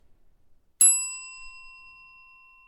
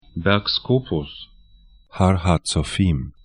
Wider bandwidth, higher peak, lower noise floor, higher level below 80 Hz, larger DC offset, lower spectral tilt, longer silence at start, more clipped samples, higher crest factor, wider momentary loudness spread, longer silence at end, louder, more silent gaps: first, 18 kHz vs 11 kHz; second, -6 dBFS vs 0 dBFS; first, -58 dBFS vs -51 dBFS; second, -62 dBFS vs -36 dBFS; neither; second, 4 dB/octave vs -5.5 dB/octave; first, 0.8 s vs 0.15 s; neither; about the same, 22 dB vs 20 dB; first, 25 LU vs 13 LU; first, 1 s vs 0.15 s; about the same, -19 LUFS vs -21 LUFS; neither